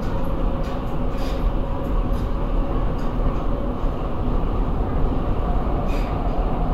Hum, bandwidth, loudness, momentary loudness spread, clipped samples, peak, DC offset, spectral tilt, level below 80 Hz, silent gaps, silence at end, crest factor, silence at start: none; 6.8 kHz; -25 LUFS; 2 LU; under 0.1%; -8 dBFS; 0.4%; -8.5 dB/octave; -22 dBFS; none; 0 s; 12 dB; 0 s